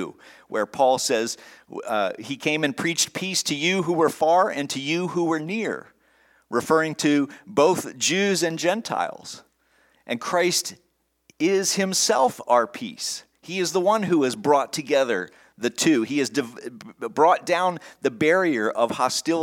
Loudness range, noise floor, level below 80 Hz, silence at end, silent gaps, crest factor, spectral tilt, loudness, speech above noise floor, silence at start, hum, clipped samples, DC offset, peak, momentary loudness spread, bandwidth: 2 LU; -63 dBFS; -72 dBFS; 0 s; none; 18 dB; -3.5 dB/octave; -23 LUFS; 40 dB; 0 s; none; under 0.1%; under 0.1%; -6 dBFS; 11 LU; 18 kHz